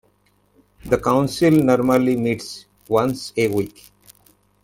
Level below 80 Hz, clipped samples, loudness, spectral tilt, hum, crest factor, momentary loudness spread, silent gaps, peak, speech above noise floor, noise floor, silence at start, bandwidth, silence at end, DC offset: -50 dBFS; under 0.1%; -19 LUFS; -6.5 dB/octave; 50 Hz at -50 dBFS; 18 dB; 12 LU; none; -4 dBFS; 43 dB; -61 dBFS; 0.85 s; 17 kHz; 0.95 s; under 0.1%